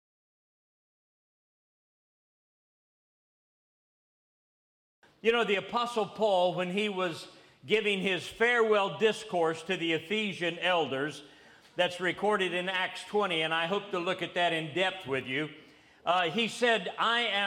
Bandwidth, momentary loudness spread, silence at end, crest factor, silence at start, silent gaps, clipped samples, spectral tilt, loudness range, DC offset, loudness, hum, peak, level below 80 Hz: 15.5 kHz; 7 LU; 0 s; 20 dB; 5.25 s; none; under 0.1%; -4 dB/octave; 3 LU; under 0.1%; -29 LUFS; none; -12 dBFS; -74 dBFS